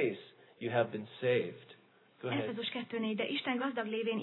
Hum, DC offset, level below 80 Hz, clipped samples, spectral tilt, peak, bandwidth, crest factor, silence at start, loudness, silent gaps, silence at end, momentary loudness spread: none; under 0.1%; -88 dBFS; under 0.1%; -8.5 dB/octave; -18 dBFS; 4.2 kHz; 18 dB; 0 s; -36 LUFS; none; 0 s; 10 LU